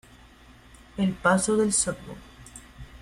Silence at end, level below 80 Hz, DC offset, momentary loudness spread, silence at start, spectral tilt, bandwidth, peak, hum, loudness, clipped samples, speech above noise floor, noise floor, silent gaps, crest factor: 0.05 s; -50 dBFS; under 0.1%; 23 LU; 0.95 s; -4 dB/octave; 13 kHz; -8 dBFS; none; -24 LUFS; under 0.1%; 27 dB; -52 dBFS; none; 20 dB